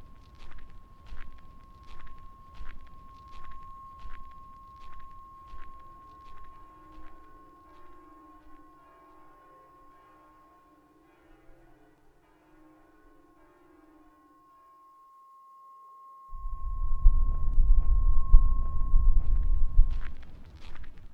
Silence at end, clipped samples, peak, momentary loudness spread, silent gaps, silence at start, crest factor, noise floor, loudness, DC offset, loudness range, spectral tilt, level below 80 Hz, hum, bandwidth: 0 s; under 0.1%; -4 dBFS; 27 LU; none; 0 s; 22 dB; -61 dBFS; -31 LUFS; under 0.1%; 26 LU; -8.5 dB/octave; -28 dBFS; none; 2.2 kHz